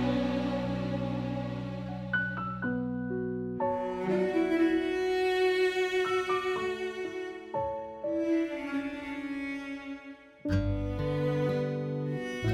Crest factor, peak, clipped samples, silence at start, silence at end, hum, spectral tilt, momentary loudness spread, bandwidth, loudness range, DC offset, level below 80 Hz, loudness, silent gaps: 14 dB; -16 dBFS; under 0.1%; 0 s; 0 s; none; -7 dB/octave; 10 LU; 12.5 kHz; 5 LU; under 0.1%; -50 dBFS; -31 LUFS; none